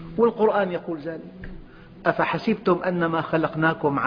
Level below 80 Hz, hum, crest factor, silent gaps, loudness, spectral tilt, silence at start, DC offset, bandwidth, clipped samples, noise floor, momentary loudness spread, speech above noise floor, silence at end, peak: -50 dBFS; none; 20 dB; none; -23 LUFS; -9 dB/octave; 0 s; under 0.1%; 5.2 kHz; under 0.1%; -43 dBFS; 15 LU; 20 dB; 0 s; -4 dBFS